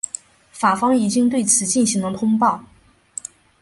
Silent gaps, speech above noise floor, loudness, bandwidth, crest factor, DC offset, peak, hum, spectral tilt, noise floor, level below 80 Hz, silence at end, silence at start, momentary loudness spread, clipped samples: none; 20 dB; -18 LUFS; 11.5 kHz; 16 dB; under 0.1%; -4 dBFS; none; -3.5 dB/octave; -38 dBFS; -58 dBFS; 1 s; 0.55 s; 17 LU; under 0.1%